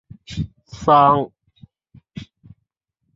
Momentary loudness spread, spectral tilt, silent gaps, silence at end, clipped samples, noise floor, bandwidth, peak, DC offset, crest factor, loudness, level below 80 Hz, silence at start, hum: 25 LU; -7 dB/octave; none; 0.95 s; under 0.1%; -74 dBFS; 7.8 kHz; -2 dBFS; under 0.1%; 20 dB; -17 LUFS; -46 dBFS; 0.3 s; none